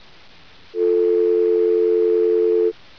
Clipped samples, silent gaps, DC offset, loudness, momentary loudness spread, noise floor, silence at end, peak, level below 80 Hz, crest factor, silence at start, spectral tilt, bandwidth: under 0.1%; none; under 0.1%; -18 LUFS; 3 LU; -49 dBFS; 0.25 s; -10 dBFS; -64 dBFS; 8 dB; 0.75 s; -7 dB/octave; 5.4 kHz